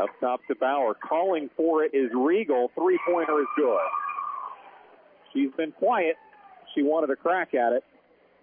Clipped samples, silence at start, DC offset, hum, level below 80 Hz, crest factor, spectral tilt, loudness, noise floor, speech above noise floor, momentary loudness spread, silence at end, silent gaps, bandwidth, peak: under 0.1%; 0 s; under 0.1%; none; -84 dBFS; 12 dB; -9 dB/octave; -26 LUFS; -60 dBFS; 35 dB; 9 LU; 0.6 s; none; 3.6 kHz; -14 dBFS